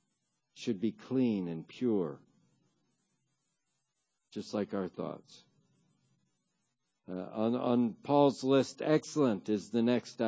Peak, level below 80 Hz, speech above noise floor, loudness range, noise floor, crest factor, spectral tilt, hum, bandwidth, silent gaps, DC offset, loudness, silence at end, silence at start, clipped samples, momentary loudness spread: -14 dBFS; -76 dBFS; 52 dB; 12 LU; -83 dBFS; 20 dB; -6.5 dB/octave; none; 8 kHz; none; under 0.1%; -32 LUFS; 0 s; 0.55 s; under 0.1%; 15 LU